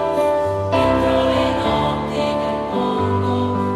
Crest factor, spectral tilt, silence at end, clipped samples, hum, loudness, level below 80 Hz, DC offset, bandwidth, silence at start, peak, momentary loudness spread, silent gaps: 14 dB; -6.5 dB/octave; 0 s; under 0.1%; none; -19 LUFS; -38 dBFS; under 0.1%; 13.5 kHz; 0 s; -4 dBFS; 4 LU; none